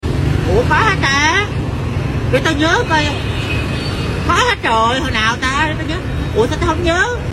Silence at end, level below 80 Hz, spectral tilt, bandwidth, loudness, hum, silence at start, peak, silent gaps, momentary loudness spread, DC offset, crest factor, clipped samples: 0 s; -26 dBFS; -5 dB/octave; 14 kHz; -15 LUFS; none; 0.05 s; 0 dBFS; none; 7 LU; under 0.1%; 14 dB; under 0.1%